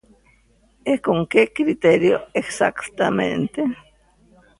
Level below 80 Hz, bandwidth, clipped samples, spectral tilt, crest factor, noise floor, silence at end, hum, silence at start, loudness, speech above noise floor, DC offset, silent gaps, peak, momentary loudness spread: -56 dBFS; 11.5 kHz; under 0.1%; -5.5 dB/octave; 20 dB; -58 dBFS; 0.85 s; none; 0.85 s; -20 LUFS; 39 dB; under 0.1%; none; -2 dBFS; 9 LU